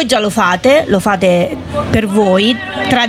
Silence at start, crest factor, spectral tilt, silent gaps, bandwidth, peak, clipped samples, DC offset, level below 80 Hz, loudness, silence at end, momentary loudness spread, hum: 0 s; 12 dB; -5 dB/octave; none; 16.5 kHz; 0 dBFS; under 0.1%; under 0.1%; -40 dBFS; -12 LUFS; 0 s; 6 LU; none